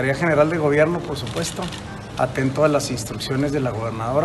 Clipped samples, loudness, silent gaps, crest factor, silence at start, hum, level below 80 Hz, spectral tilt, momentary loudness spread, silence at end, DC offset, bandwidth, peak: under 0.1%; -21 LUFS; none; 18 dB; 0 s; none; -44 dBFS; -5.5 dB/octave; 10 LU; 0 s; under 0.1%; 12.5 kHz; -4 dBFS